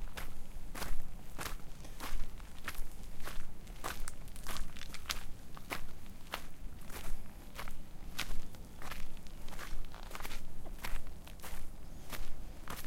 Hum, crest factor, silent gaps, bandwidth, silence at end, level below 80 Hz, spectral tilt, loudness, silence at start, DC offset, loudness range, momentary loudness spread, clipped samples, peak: none; 18 dB; none; 16 kHz; 0 s; -42 dBFS; -3 dB/octave; -47 LUFS; 0 s; under 0.1%; 3 LU; 9 LU; under 0.1%; -14 dBFS